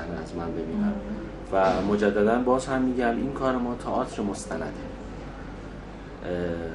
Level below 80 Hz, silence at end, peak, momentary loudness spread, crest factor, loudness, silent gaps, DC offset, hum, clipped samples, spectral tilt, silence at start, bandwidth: -44 dBFS; 0 s; -8 dBFS; 16 LU; 18 dB; -27 LUFS; none; under 0.1%; none; under 0.1%; -6.5 dB/octave; 0 s; 11.5 kHz